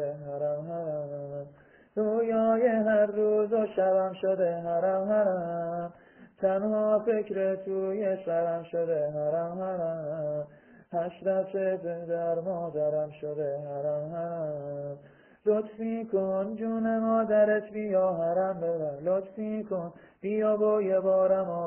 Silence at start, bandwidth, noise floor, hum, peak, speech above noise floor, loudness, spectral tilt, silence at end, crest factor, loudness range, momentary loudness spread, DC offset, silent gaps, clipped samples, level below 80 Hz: 0 s; 3.3 kHz; -55 dBFS; none; -14 dBFS; 27 dB; -29 LUFS; -11 dB/octave; 0 s; 14 dB; 5 LU; 10 LU; under 0.1%; none; under 0.1%; -70 dBFS